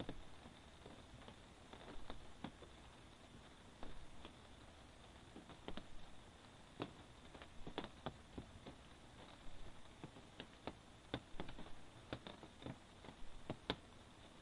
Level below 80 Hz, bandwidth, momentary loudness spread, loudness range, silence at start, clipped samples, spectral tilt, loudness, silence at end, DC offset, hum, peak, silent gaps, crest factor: -64 dBFS; 11 kHz; 10 LU; 5 LU; 0 s; under 0.1%; -5 dB/octave; -56 LUFS; 0 s; under 0.1%; none; -20 dBFS; none; 32 dB